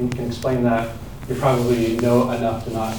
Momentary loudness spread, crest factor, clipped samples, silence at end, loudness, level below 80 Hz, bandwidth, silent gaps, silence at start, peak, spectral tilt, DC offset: 9 LU; 16 dB; under 0.1%; 0 s; -21 LUFS; -42 dBFS; over 20 kHz; none; 0 s; -4 dBFS; -7 dB/octave; 0.8%